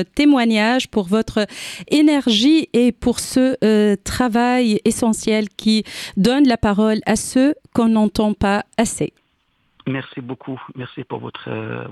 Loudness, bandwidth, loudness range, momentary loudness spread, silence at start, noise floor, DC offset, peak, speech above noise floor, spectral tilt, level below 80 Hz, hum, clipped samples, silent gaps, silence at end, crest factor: -17 LUFS; 14 kHz; 6 LU; 15 LU; 0 s; -64 dBFS; under 0.1%; -2 dBFS; 47 dB; -4.5 dB/octave; -42 dBFS; none; under 0.1%; none; 0 s; 16 dB